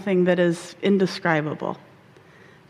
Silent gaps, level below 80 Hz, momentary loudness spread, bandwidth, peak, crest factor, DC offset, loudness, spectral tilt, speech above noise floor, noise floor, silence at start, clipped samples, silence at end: none; -68 dBFS; 11 LU; 12 kHz; -6 dBFS; 18 dB; under 0.1%; -22 LUFS; -6.5 dB/octave; 29 dB; -51 dBFS; 0 s; under 0.1%; 0.9 s